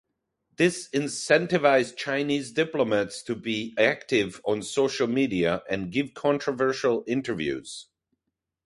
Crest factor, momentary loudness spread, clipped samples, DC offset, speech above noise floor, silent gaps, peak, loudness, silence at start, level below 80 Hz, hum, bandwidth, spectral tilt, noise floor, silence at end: 20 dB; 8 LU; under 0.1%; under 0.1%; 58 dB; none; -6 dBFS; -26 LUFS; 0.6 s; -62 dBFS; none; 11.5 kHz; -4.5 dB/octave; -83 dBFS; 0.8 s